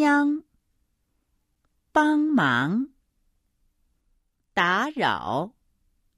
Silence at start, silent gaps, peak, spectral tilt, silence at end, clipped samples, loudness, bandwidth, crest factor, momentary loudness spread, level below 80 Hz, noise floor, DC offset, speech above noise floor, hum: 0 s; none; -8 dBFS; -5.5 dB/octave; 0.7 s; under 0.1%; -24 LUFS; 12 kHz; 18 dB; 10 LU; -64 dBFS; -73 dBFS; under 0.1%; 50 dB; none